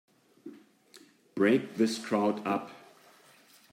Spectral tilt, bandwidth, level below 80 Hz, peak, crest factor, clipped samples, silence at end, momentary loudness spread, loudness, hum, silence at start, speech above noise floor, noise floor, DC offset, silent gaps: -5.5 dB/octave; 16 kHz; -82 dBFS; -14 dBFS; 20 dB; under 0.1%; 0.95 s; 24 LU; -29 LUFS; none; 0.45 s; 31 dB; -60 dBFS; under 0.1%; none